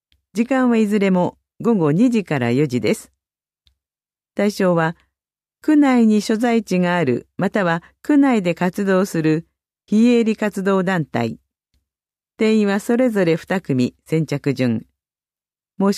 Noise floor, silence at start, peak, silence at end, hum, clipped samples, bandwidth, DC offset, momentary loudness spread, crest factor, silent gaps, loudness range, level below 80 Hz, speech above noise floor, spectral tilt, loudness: under -90 dBFS; 0.35 s; -4 dBFS; 0 s; none; under 0.1%; 14 kHz; under 0.1%; 8 LU; 14 dB; none; 3 LU; -60 dBFS; over 73 dB; -7 dB/octave; -18 LUFS